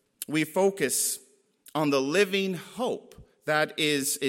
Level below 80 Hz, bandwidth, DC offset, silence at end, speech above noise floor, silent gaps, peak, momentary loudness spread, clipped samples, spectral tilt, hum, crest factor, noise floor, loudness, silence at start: -68 dBFS; 16.5 kHz; under 0.1%; 0 s; 31 dB; none; -10 dBFS; 10 LU; under 0.1%; -3 dB/octave; none; 18 dB; -58 dBFS; -27 LUFS; 0.2 s